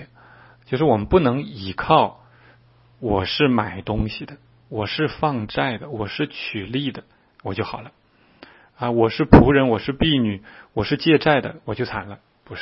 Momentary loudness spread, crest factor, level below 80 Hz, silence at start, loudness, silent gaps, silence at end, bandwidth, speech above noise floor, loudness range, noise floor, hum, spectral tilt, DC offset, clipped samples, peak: 15 LU; 22 dB; -38 dBFS; 0 s; -20 LUFS; none; 0 s; 5.8 kHz; 34 dB; 9 LU; -54 dBFS; none; -9.5 dB/octave; under 0.1%; under 0.1%; 0 dBFS